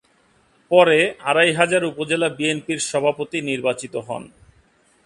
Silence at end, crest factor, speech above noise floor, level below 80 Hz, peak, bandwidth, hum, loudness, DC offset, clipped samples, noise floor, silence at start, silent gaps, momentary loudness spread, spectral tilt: 0.8 s; 20 dB; 40 dB; -62 dBFS; 0 dBFS; 11.5 kHz; none; -19 LUFS; under 0.1%; under 0.1%; -59 dBFS; 0.7 s; none; 13 LU; -3.5 dB/octave